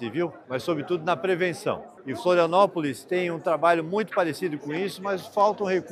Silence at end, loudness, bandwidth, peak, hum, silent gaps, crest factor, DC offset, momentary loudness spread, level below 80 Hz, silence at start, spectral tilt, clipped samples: 0 s; -25 LUFS; 15 kHz; -6 dBFS; none; none; 18 dB; under 0.1%; 9 LU; -74 dBFS; 0 s; -5.5 dB/octave; under 0.1%